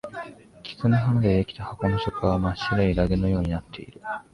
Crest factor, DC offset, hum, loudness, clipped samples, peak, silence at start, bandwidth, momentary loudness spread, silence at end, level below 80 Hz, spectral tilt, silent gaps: 16 dB; under 0.1%; none; -24 LUFS; under 0.1%; -8 dBFS; 0.05 s; 11 kHz; 17 LU; 0.1 s; -38 dBFS; -8.5 dB/octave; none